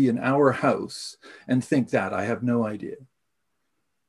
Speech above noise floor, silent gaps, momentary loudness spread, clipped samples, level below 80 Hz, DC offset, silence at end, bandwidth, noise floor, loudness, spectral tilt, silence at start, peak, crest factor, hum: 55 dB; none; 17 LU; under 0.1%; -62 dBFS; under 0.1%; 1.05 s; 12 kHz; -80 dBFS; -24 LUFS; -6.5 dB/octave; 0 s; -6 dBFS; 20 dB; none